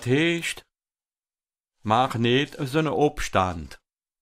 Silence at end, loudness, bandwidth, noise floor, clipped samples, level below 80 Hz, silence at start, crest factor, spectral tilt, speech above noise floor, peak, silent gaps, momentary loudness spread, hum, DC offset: 0.45 s; -24 LUFS; 15.5 kHz; under -90 dBFS; under 0.1%; -48 dBFS; 0 s; 20 dB; -5.5 dB/octave; over 67 dB; -6 dBFS; 1.60-1.64 s; 15 LU; none; under 0.1%